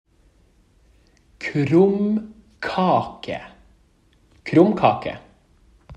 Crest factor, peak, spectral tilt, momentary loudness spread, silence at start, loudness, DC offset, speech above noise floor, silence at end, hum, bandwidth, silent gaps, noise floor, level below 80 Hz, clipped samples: 22 dB; -2 dBFS; -8 dB/octave; 16 LU; 1.4 s; -20 LUFS; under 0.1%; 39 dB; 0 s; none; 9 kHz; none; -58 dBFS; -56 dBFS; under 0.1%